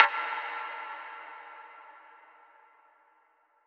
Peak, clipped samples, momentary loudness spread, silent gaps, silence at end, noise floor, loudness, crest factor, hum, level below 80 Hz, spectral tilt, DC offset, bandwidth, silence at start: 0 dBFS; under 0.1%; 21 LU; none; 1.5 s; -68 dBFS; -33 LUFS; 34 dB; none; under -90 dBFS; 1 dB/octave; under 0.1%; 6.8 kHz; 0 s